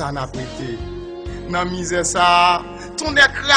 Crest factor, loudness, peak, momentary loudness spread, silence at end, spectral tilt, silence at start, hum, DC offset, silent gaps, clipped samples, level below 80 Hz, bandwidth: 18 dB; -17 LUFS; 0 dBFS; 17 LU; 0 s; -2.5 dB/octave; 0 s; none; under 0.1%; none; under 0.1%; -38 dBFS; 10.5 kHz